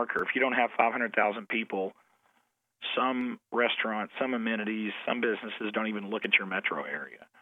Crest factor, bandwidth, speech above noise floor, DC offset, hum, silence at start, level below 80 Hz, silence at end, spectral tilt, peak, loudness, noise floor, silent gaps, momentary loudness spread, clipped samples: 24 dB; 4.5 kHz; 43 dB; under 0.1%; none; 0 s; -80 dBFS; 0.15 s; -6.5 dB/octave; -6 dBFS; -30 LUFS; -74 dBFS; none; 9 LU; under 0.1%